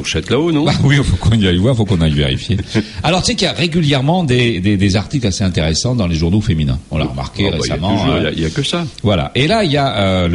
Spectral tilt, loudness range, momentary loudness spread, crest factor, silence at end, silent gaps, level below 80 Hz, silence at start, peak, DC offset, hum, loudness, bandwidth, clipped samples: -5.5 dB/octave; 2 LU; 5 LU; 14 dB; 0 s; none; -30 dBFS; 0 s; 0 dBFS; under 0.1%; none; -15 LUFS; 11.5 kHz; under 0.1%